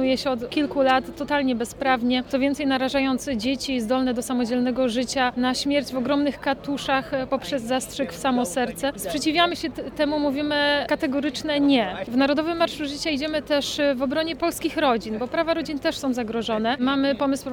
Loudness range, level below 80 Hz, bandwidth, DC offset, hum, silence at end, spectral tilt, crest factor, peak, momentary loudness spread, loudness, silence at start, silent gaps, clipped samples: 2 LU; -50 dBFS; 18.5 kHz; under 0.1%; none; 0 s; -4 dB/octave; 16 dB; -6 dBFS; 5 LU; -23 LUFS; 0 s; none; under 0.1%